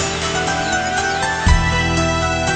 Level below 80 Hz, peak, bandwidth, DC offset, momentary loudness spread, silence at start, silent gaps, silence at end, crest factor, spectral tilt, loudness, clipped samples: -24 dBFS; -2 dBFS; 9.2 kHz; under 0.1%; 3 LU; 0 s; none; 0 s; 16 dB; -4 dB/octave; -17 LUFS; under 0.1%